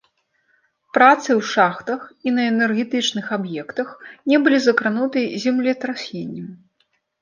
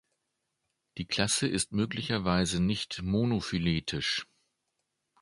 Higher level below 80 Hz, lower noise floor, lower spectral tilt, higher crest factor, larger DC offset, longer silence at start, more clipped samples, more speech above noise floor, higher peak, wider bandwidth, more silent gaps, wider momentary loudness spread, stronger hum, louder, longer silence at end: second, -70 dBFS vs -52 dBFS; second, -67 dBFS vs -82 dBFS; about the same, -4.5 dB/octave vs -4 dB/octave; about the same, 18 dB vs 22 dB; neither; about the same, 0.95 s vs 0.95 s; neither; second, 48 dB vs 52 dB; first, -2 dBFS vs -10 dBFS; second, 7.4 kHz vs 11.5 kHz; neither; first, 15 LU vs 6 LU; neither; first, -19 LUFS vs -30 LUFS; second, 0.65 s vs 1 s